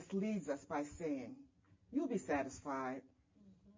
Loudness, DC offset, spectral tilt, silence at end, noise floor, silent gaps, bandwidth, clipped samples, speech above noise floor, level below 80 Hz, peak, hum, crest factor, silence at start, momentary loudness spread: -42 LUFS; under 0.1%; -6.5 dB/octave; 0.05 s; -67 dBFS; none; 7.6 kHz; under 0.1%; 25 dB; -70 dBFS; -26 dBFS; none; 16 dB; 0 s; 8 LU